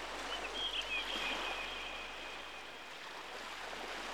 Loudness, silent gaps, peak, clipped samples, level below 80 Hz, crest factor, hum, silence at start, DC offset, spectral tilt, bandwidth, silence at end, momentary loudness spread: -40 LUFS; none; -26 dBFS; under 0.1%; -62 dBFS; 16 dB; none; 0 s; 0.1%; -1 dB/octave; over 20 kHz; 0 s; 10 LU